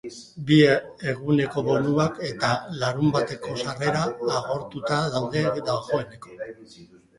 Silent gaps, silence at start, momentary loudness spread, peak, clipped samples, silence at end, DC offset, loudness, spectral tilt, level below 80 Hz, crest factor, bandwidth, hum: none; 0.05 s; 14 LU; -4 dBFS; under 0.1%; 0.35 s; under 0.1%; -24 LUFS; -6 dB/octave; -56 dBFS; 20 dB; 11.5 kHz; none